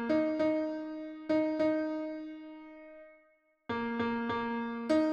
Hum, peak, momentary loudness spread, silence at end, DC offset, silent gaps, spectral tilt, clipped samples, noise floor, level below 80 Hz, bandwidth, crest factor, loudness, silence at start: none; -18 dBFS; 20 LU; 0 s; under 0.1%; none; -6.5 dB/octave; under 0.1%; -69 dBFS; -68 dBFS; 8.2 kHz; 16 dB; -33 LUFS; 0 s